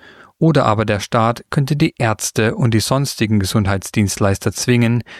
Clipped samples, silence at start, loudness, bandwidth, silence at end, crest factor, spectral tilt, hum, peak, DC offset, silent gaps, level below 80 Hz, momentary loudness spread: under 0.1%; 0.4 s; -17 LUFS; 15 kHz; 0 s; 16 dB; -5.5 dB/octave; none; -2 dBFS; under 0.1%; none; -44 dBFS; 4 LU